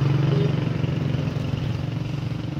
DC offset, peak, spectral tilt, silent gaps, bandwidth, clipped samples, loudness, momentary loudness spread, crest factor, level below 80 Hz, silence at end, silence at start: under 0.1%; -10 dBFS; -8 dB/octave; none; 7 kHz; under 0.1%; -25 LUFS; 7 LU; 14 dB; -42 dBFS; 0 s; 0 s